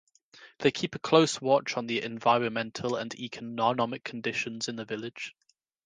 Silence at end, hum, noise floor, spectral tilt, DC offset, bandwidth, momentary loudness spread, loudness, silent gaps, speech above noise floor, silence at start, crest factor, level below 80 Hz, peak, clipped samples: 0.55 s; none; -56 dBFS; -4.5 dB/octave; under 0.1%; 10 kHz; 13 LU; -29 LUFS; none; 27 dB; 0.35 s; 24 dB; -72 dBFS; -6 dBFS; under 0.1%